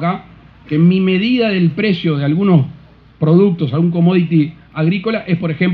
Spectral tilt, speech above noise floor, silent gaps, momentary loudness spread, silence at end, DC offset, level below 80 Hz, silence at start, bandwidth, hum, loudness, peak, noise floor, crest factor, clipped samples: -10.5 dB/octave; 27 dB; none; 8 LU; 0 s; under 0.1%; -50 dBFS; 0 s; 4.9 kHz; none; -14 LUFS; 0 dBFS; -40 dBFS; 14 dB; under 0.1%